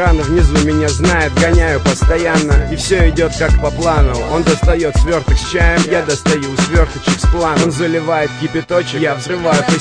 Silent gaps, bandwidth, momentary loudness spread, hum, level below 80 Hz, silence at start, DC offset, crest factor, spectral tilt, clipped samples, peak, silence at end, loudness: none; 10.5 kHz; 4 LU; none; -18 dBFS; 0 s; under 0.1%; 12 dB; -5 dB/octave; under 0.1%; 0 dBFS; 0 s; -14 LUFS